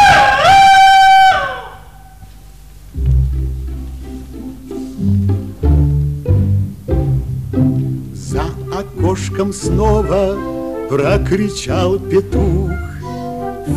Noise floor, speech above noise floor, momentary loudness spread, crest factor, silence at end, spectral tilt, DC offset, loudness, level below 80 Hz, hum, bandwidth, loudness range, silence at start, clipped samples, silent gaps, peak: -37 dBFS; 23 dB; 19 LU; 12 dB; 0 s; -5.5 dB/octave; 0.6%; -14 LUFS; -24 dBFS; none; 15.5 kHz; 9 LU; 0 s; under 0.1%; none; -2 dBFS